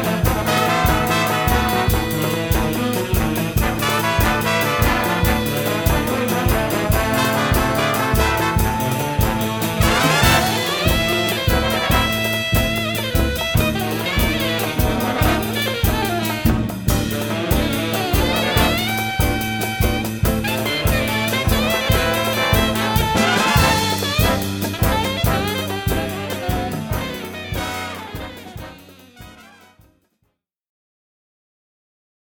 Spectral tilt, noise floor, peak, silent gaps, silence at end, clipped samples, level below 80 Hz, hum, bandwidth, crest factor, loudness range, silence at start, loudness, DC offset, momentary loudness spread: -4.5 dB/octave; -70 dBFS; 0 dBFS; none; 2.9 s; under 0.1%; -28 dBFS; none; over 20 kHz; 18 dB; 7 LU; 0 s; -18 LUFS; under 0.1%; 6 LU